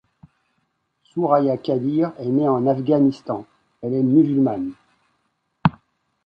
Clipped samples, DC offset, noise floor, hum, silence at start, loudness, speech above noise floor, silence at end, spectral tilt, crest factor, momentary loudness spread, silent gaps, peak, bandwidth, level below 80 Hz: under 0.1%; under 0.1%; -71 dBFS; none; 1.15 s; -20 LUFS; 52 dB; 0.55 s; -10 dB/octave; 20 dB; 13 LU; none; -2 dBFS; 5.8 kHz; -56 dBFS